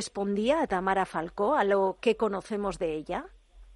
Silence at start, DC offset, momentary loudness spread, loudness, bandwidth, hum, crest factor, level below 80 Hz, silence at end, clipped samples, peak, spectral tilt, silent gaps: 0 s; under 0.1%; 8 LU; -28 LUFS; 11.5 kHz; none; 16 dB; -54 dBFS; 0 s; under 0.1%; -12 dBFS; -5 dB/octave; none